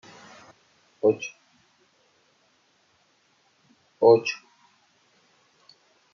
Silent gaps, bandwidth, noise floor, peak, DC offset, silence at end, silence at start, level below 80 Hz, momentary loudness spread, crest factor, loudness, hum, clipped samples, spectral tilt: none; 7 kHz; -65 dBFS; -6 dBFS; under 0.1%; 1.75 s; 1.05 s; -80 dBFS; 29 LU; 24 dB; -23 LUFS; none; under 0.1%; -5.5 dB/octave